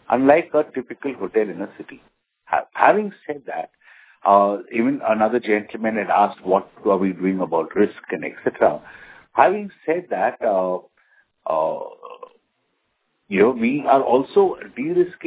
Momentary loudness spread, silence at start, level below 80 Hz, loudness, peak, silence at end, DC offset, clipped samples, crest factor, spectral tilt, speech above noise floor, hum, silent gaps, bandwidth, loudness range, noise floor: 14 LU; 0.1 s; -62 dBFS; -20 LUFS; 0 dBFS; 0 s; under 0.1%; under 0.1%; 20 dB; -10 dB/octave; 51 dB; none; none; 4 kHz; 4 LU; -71 dBFS